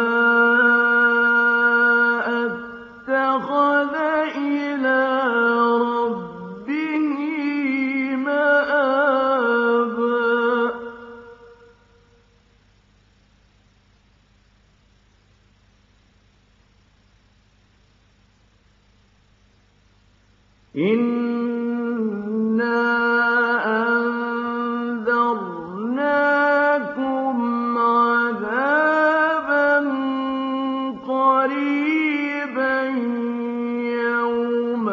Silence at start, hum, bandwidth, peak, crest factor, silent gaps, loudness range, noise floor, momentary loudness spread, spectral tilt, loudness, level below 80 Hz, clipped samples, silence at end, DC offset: 0 s; none; 7 kHz; -6 dBFS; 14 dB; none; 6 LU; -57 dBFS; 9 LU; -2.5 dB/octave; -20 LUFS; -64 dBFS; under 0.1%; 0 s; under 0.1%